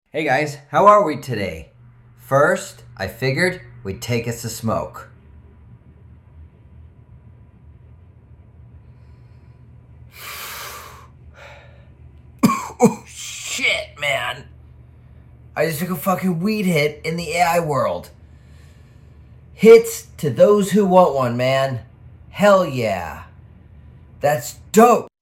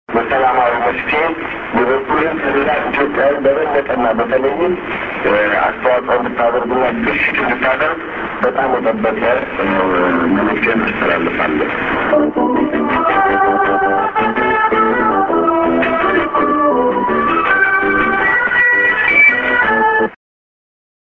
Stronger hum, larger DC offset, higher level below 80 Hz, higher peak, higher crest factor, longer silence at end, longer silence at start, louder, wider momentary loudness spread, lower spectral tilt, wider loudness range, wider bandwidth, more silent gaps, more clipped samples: neither; neither; second, -50 dBFS vs -42 dBFS; about the same, 0 dBFS vs 0 dBFS; first, 20 dB vs 14 dB; second, 0.15 s vs 1.05 s; about the same, 0.15 s vs 0.1 s; second, -18 LUFS vs -14 LUFS; first, 19 LU vs 5 LU; second, -5 dB/octave vs -7.5 dB/octave; first, 21 LU vs 4 LU; first, 16.5 kHz vs 6.8 kHz; neither; neither